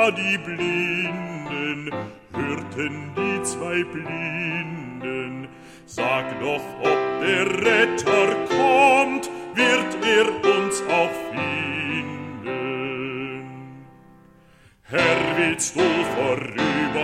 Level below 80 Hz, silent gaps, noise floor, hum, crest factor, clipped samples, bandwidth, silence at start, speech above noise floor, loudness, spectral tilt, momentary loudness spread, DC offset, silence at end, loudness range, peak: -58 dBFS; none; -53 dBFS; none; 18 dB; under 0.1%; 15 kHz; 0 s; 31 dB; -22 LUFS; -4 dB/octave; 13 LU; under 0.1%; 0 s; 8 LU; -4 dBFS